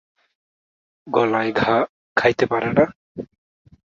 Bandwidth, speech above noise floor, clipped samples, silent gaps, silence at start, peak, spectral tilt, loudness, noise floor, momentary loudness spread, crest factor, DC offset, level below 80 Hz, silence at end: 7.4 kHz; over 71 dB; under 0.1%; 1.89-2.16 s, 2.95-3.15 s; 1.05 s; -2 dBFS; -6.5 dB/octave; -20 LUFS; under -90 dBFS; 18 LU; 20 dB; under 0.1%; -54 dBFS; 0.75 s